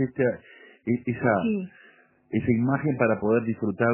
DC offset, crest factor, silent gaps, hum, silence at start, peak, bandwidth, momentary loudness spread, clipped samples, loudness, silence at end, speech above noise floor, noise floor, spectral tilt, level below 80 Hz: under 0.1%; 18 dB; none; none; 0 s; -6 dBFS; 3.2 kHz; 8 LU; under 0.1%; -25 LUFS; 0 s; 32 dB; -56 dBFS; -12 dB/octave; -56 dBFS